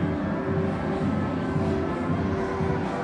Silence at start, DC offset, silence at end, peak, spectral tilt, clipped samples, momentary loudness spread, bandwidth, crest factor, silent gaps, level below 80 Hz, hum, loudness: 0 s; under 0.1%; 0 s; -12 dBFS; -8.5 dB/octave; under 0.1%; 1 LU; 10.5 kHz; 14 dB; none; -46 dBFS; none; -27 LUFS